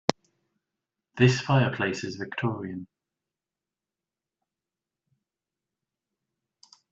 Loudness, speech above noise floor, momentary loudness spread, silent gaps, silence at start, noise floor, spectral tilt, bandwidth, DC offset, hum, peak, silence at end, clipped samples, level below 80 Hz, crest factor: -26 LUFS; over 65 dB; 15 LU; none; 0.1 s; under -90 dBFS; -6 dB/octave; 8 kHz; under 0.1%; none; -2 dBFS; 4.1 s; under 0.1%; -64 dBFS; 28 dB